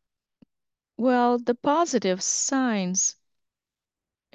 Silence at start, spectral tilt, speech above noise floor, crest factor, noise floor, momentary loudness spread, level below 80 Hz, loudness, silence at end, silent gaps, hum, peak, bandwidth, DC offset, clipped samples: 1 s; -3.5 dB/octave; over 67 dB; 16 dB; under -90 dBFS; 3 LU; -74 dBFS; -24 LUFS; 1.25 s; none; none; -10 dBFS; 9.2 kHz; under 0.1%; under 0.1%